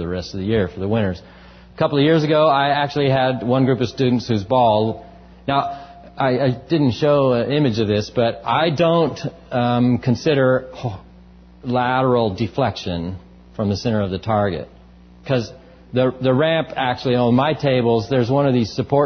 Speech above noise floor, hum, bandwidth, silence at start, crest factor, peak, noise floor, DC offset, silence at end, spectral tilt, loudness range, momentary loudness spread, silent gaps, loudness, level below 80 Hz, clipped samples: 27 dB; none; 6.6 kHz; 0 s; 16 dB; -4 dBFS; -45 dBFS; under 0.1%; 0 s; -7 dB/octave; 4 LU; 12 LU; none; -19 LUFS; -44 dBFS; under 0.1%